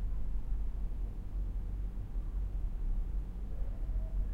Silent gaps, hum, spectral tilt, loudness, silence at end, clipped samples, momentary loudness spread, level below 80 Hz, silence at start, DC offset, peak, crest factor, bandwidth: none; none; -9 dB/octave; -41 LUFS; 0 s; under 0.1%; 3 LU; -36 dBFS; 0 s; under 0.1%; -24 dBFS; 10 dB; 2.9 kHz